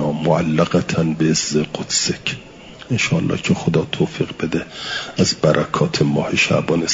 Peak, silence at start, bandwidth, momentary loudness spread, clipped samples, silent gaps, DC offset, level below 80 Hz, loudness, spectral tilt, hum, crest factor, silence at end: -2 dBFS; 0 s; 7.8 kHz; 8 LU; under 0.1%; none; under 0.1%; -50 dBFS; -18 LUFS; -4.5 dB/octave; none; 16 dB; 0 s